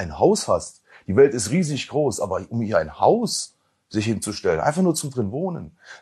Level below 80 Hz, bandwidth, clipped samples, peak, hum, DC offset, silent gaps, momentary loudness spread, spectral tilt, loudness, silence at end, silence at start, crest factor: -52 dBFS; 12.5 kHz; under 0.1%; -4 dBFS; none; under 0.1%; none; 12 LU; -5 dB/octave; -22 LUFS; 0.05 s; 0 s; 18 dB